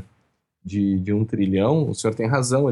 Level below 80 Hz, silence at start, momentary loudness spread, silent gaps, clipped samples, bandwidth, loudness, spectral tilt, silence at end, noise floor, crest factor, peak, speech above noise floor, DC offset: -58 dBFS; 0 s; 5 LU; none; under 0.1%; 12 kHz; -22 LUFS; -6.5 dB/octave; 0 s; -68 dBFS; 14 dB; -8 dBFS; 48 dB; under 0.1%